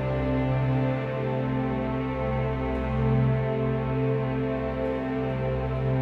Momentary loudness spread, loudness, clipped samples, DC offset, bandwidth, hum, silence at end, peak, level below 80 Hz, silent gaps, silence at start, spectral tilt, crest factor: 4 LU; -27 LUFS; under 0.1%; under 0.1%; 4.7 kHz; none; 0 s; -12 dBFS; -38 dBFS; none; 0 s; -10 dB/octave; 12 dB